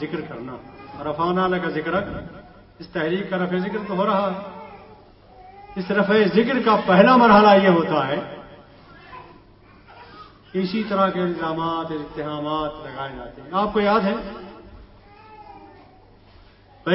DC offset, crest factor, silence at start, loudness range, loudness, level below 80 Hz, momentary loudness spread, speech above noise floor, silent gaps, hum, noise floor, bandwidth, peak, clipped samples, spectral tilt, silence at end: under 0.1%; 22 dB; 0 s; 10 LU; -20 LUFS; -52 dBFS; 23 LU; 30 dB; none; none; -50 dBFS; 5.8 kHz; 0 dBFS; under 0.1%; -10.5 dB/octave; 0 s